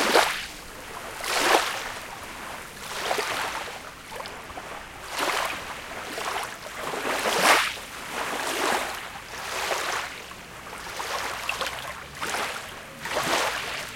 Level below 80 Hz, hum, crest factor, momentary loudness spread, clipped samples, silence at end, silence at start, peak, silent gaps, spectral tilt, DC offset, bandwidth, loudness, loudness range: -54 dBFS; none; 26 dB; 16 LU; under 0.1%; 0 s; 0 s; -2 dBFS; none; -1 dB/octave; under 0.1%; 17 kHz; -27 LUFS; 6 LU